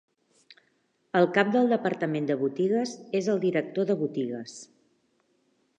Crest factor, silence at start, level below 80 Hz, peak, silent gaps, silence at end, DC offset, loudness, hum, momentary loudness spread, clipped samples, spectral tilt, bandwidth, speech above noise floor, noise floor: 20 dB; 1.15 s; -82 dBFS; -8 dBFS; none; 1.15 s; under 0.1%; -27 LUFS; none; 10 LU; under 0.1%; -6 dB/octave; 9.8 kHz; 45 dB; -71 dBFS